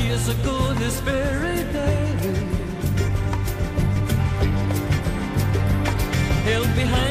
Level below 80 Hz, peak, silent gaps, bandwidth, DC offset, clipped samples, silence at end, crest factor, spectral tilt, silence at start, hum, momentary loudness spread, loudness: -30 dBFS; -10 dBFS; none; 15.5 kHz; under 0.1%; under 0.1%; 0 s; 12 dB; -6 dB/octave; 0 s; none; 4 LU; -22 LUFS